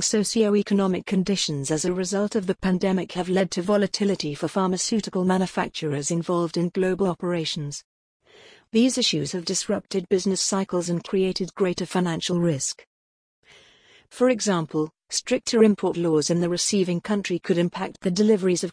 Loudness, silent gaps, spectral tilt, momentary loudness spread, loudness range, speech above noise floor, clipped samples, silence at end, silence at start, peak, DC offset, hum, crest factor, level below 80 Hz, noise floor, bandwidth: -24 LUFS; 7.84-8.20 s, 12.87-13.43 s; -4.5 dB/octave; 6 LU; 4 LU; 32 dB; under 0.1%; 0 s; 0 s; -6 dBFS; under 0.1%; none; 18 dB; -58 dBFS; -55 dBFS; 10.5 kHz